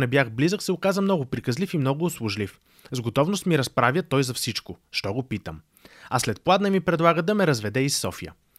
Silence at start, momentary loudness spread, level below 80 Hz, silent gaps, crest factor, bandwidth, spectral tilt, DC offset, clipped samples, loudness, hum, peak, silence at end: 0 s; 11 LU; -56 dBFS; none; 20 dB; 16 kHz; -5 dB/octave; under 0.1%; under 0.1%; -24 LUFS; none; -4 dBFS; 0.25 s